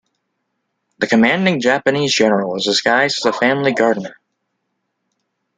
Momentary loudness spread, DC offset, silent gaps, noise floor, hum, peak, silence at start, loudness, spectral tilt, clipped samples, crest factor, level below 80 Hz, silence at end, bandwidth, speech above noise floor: 4 LU; under 0.1%; none; -72 dBFS; none; 0 dBFS; 1 s; -15 LUFS; -4 dB/octave; under 0.1%; 18 dB; -62 dBFS; 1.45 s; 9.4 kHz; 57 dB